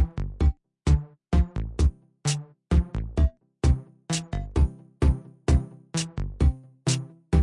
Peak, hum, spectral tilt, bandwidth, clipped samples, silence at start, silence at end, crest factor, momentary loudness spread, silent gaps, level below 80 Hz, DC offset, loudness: -8 dBFS; none; -6 dB/octave; 11 kHz; under 0.1%; 0 s; 0 s; 16 dB; 6 LU; none; -28 dBFS; under 0.1%; -27 LUFS